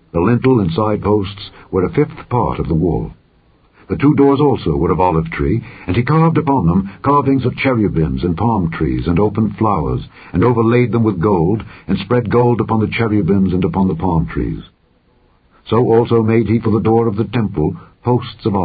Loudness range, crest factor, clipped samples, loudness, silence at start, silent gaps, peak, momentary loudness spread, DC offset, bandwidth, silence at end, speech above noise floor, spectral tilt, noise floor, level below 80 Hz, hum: 2 LU; 14 dB; under 0.1%; -15 LUFS; 0.15 s; none; -2 dBFS; 8 LU; under 0.1%; 4.9 kHz; 0 s; 40 dB; -13.5 dB/octave; -55 dBFS; -32 dBFS; none